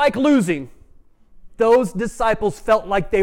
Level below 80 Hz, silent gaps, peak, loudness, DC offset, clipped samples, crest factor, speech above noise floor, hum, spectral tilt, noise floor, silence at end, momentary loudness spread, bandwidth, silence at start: -40 dBFS; none; -6 dBFS; -18 LUFS; under 0.1%; under 0.1%; 14 dB; 31 dB; none; -6 dB/octave; -48 dBFS; 0 s; 8 LU; 16 kHz; 0 s